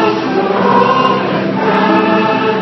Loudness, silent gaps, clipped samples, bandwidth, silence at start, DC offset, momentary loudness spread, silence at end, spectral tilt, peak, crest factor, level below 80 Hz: -12 LUFS; none; under 0.1%; 6.2 kHz; 0 s; under 0.1%; 4 LU; 0 s; -7 dB/octave; 0 dBFS; 12 dB; -54 dBFS